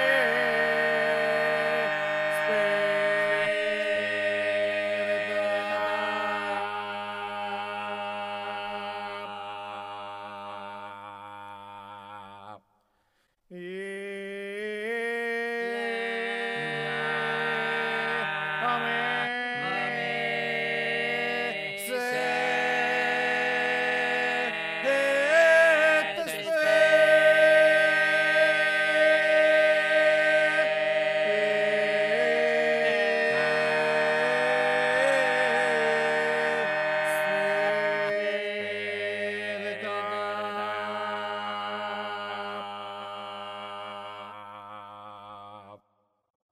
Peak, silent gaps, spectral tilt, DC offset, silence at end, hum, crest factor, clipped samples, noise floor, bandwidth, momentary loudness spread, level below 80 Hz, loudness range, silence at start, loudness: -10 dBFS; none; -3 dB/octave; under 0.1%; 0.75 s; none; 18 dB; under 0.1%; -72 dBFS; 14.5 kHz; 17 LU; -76 dBFS; 17 LU; 0 s; -25 LUFS